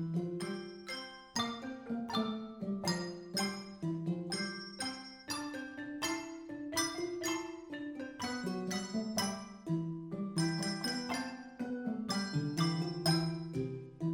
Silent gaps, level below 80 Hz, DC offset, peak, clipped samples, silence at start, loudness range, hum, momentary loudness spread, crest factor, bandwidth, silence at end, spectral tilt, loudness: none; -70 dBFS; under 0.1%; -18 dBFS; under 0.1%; 0 s; 3 LU; none; 9 LU; 20 dB; 17 kHz; 0 s; -4.5 dB/octave; -38 LUFS